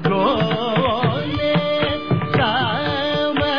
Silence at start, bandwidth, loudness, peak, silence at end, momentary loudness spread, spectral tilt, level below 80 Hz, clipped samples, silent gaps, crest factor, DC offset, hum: 0 s; 5.4 kHz; -19 LUFS; -6 dBFS; 0 s; 3 LU; -7.5 dB/octave; -44 dBFS; under 0.1%; none; 14 dB; 0.9%; none